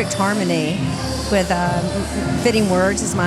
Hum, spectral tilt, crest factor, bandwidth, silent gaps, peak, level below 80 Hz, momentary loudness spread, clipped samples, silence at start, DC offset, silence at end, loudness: none; -5 dB/octave; 16 dB; 15 kHz; none; -2 dBFS; -36 dBFS; 6 LU; under 0.1%; 0 s; under 0.1%; 0 s; -19 LUFS